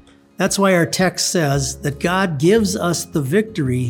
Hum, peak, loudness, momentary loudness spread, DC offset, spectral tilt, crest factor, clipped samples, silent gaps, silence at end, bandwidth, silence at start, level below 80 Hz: none; -2 dBFS; -18 LUFS; 6 LU; under 0.1%; -4.5 dB/octave; 16 dB; under 0.1%; none; 0 s; 19 kHz; 0.4 s; -44 dBFS